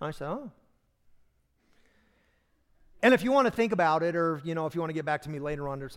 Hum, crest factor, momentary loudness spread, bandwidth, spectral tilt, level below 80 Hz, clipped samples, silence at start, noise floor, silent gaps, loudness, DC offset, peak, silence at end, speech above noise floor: none; 20 dB; 13 LU; 16.5 kHz; -6.5 dB/octave; -58 dBFS; under 0.1%; 0 s; -69 dBFS; none; -28 LUFS; under 0.1%; -10 dBFS; 0 s; 42 dB